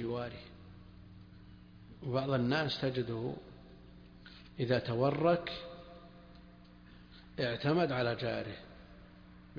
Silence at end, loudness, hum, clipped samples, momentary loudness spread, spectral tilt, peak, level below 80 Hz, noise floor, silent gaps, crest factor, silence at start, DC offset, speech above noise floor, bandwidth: 0 s; -34 LUFS; 60 Hz at -55 dBFS; under 0.1%; 25 LU; -5 dB/octave; -16 dBFS; -60 dBFS; -56 dBFS; none; 20 dB; 0 s; under 0.1%; 23 dB; 5.2 kHz